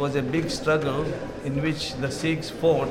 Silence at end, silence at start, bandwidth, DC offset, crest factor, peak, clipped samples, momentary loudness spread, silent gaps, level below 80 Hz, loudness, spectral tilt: 0 s; 0 s; 15.5 kHz; under 0.1%; 16 dB; -10 dBFS; under 0.1%; 6 LU; none; -46 dBFS; -26 LUFS; -5.5 dB/octave